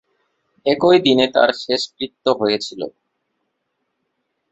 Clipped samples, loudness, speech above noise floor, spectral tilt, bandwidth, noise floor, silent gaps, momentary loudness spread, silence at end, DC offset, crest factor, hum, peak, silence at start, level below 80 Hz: under 0.1%; -17 LUFS; 56 dB; -4.5 dB/octave; 8.2 kHz; -73 dBFS; none; 14 LU; 1.65 s; under 0.1%; 18 dB; none; -2 dBFS; 0.65 s; -60 dBFS